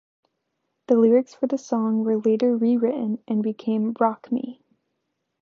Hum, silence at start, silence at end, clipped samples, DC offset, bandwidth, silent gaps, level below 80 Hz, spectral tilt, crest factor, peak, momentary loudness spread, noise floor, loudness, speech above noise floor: none; 0.9 s; 0.9 s; under 0.1%; under 0.1%; 7 kHz; none; -78 dBFS; -8 dB/octave; 16 dB; -8 dBFS; 9 LU; -77 dBFS; -22 LUFS; 56 dB